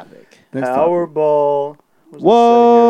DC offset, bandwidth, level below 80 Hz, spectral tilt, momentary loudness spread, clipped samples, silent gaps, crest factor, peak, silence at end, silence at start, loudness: under 0.1%; 8.8 kHz; -72 dBFS; -7 dB/octave; 14 LU; under 0.1%; none; 14 dB; 0 dBFS; 0 s; 0 s; -14 LUFS